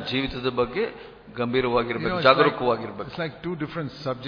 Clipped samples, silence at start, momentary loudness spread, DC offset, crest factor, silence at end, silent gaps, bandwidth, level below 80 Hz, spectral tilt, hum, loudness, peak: under 0.1%; 0 s; 13 LU; under 0.1%; 24 dB; 0 s; none; 5.2 kHz; -50 dBFS; -7.5 dB/octave; none; -24 LUFS; -2 dBFS